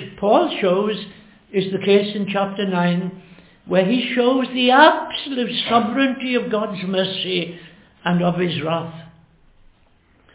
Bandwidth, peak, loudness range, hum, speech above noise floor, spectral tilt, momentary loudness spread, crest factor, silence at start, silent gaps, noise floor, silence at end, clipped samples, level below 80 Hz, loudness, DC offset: 4 kHz; 0 dBFS; 6 LU; none; 37 dB; -10 dB/octave; 9 LU; 20 dB; 0 s; none; -56 dBFS; 1.25 s; under 0.1%; -60 dBFS; -19 LUFS; under 0.1%